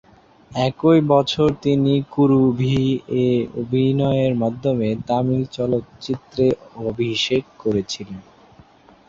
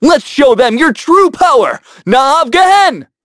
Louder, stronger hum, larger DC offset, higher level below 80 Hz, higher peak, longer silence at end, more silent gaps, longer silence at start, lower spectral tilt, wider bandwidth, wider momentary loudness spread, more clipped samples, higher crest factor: second, -20 LUFS vs -9 LUFS; neither; neither; second, -50 dBFS vs -44 dBFS; second, -4 dBFS vs 0 dBFS; first, 0.9 s vs 0.2 s; neither; first, 0.5 s vs 0 s; first, -7 dB/octave vs -4 dB/octave; second, 7.6 kHz vs 11 kHz; first, 11 LU vs 5 LU; second, under 0.1% vs 0.3%; first, 16 dB vs 8 dB